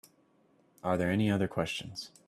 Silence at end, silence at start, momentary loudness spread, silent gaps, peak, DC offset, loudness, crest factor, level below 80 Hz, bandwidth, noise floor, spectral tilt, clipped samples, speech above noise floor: 0.2 s; 0.85 s; 10 LU; none; -14 dBFS; under 0.1%; -32 LUFS; 18 dB; -64 dBFS; 13.5 kHz; -67 dBFS; -6 dB/octave; under 0.1%; 36 dB